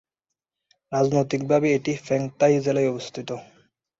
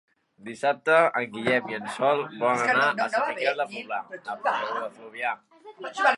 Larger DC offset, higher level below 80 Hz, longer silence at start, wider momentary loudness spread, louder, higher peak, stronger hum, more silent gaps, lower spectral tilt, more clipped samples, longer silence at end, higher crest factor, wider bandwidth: neither; first, -64 dBFS vs -74 dBFS; first, 0.9 s vs 0.45 s; about the same, 13 LU vs 15 LU; about the same, -23 LUFS vs -25 LUFS; about the same, -8 dBFS vs -6 dBFS; neither; neither; first, -6.5 dB/octave vs -4 dB/octave; neither; first, 0.55 s vs 0 s; about the same, 16 dB vs 20 dB; second, 7.8 kHz vs 11.5 kHz